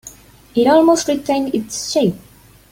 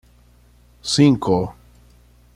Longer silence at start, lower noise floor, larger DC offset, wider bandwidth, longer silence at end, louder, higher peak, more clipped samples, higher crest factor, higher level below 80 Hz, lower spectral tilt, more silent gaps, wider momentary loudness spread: second, 0.05 s vs 0.85 s; second, -41 dBFS vs -52 dBFS; neither; first, 16.5 kHz vs 11.5 kHz; second, 0.55 s vs 0.85 s; about the same, -16 LUFS vs -18 LUFS; about the same, -2 dBFS vs -4 dBFS; neither; about the same, 16 dB vs 18 dB; about the same, -50 dBFS vs -48 dBFS; about the same, -4.5 dB/octave vs -5.5 dB/octave; neither; second, 10 LU vs 16 LU